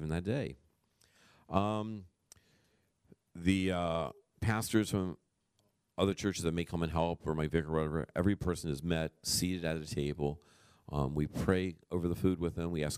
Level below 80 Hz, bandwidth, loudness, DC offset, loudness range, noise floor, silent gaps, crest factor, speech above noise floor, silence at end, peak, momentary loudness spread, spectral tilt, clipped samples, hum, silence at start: -52 dBFS; 15.5 kHz; -35 LUFS; under 0.1%; 3 LU; -77 dBFS; none; 24 dB; 43 dB; 0 s; -12 dBFS; 7 LU; -5.5 dB/octave; under 0.1%; none; 0 s